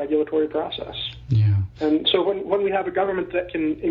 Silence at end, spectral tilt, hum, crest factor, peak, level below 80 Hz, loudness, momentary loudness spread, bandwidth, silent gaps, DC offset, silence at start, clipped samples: 0 s; -9 dB/octave; none; 16 dB; -6 dBFS; -48 dBFS; -23 LUFS; 8 LU; 5.4 kHz; none; under 0.1%; 0 s; under 0.1%